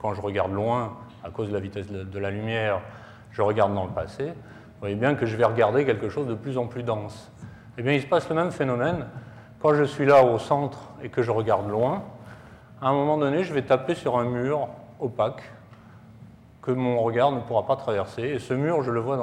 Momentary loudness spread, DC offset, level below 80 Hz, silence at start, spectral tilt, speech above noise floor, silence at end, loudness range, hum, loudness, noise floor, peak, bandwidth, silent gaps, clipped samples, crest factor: 17 LU; under 0.1%; -60 dBFS; 0 s; -7.5 dB/octave; 24 dB; 0 s; 5 LU; none; -25 LUFS; -48 dBFS; -8 dBFS; 11.5 kHz; none; under 0.1%; 18 dB